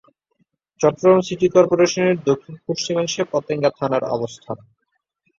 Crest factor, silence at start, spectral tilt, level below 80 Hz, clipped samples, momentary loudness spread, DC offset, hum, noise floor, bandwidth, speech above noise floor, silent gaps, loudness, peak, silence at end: 18 dB; 0.8 s; -5 dB/octave; -60 dBFS; under 0.1%; 12 LU; under 0.1%; none; -73 dBFS; 7.6 kHz; 54 dB; none; -19 LUFS; -2 dBFS; 0.8 s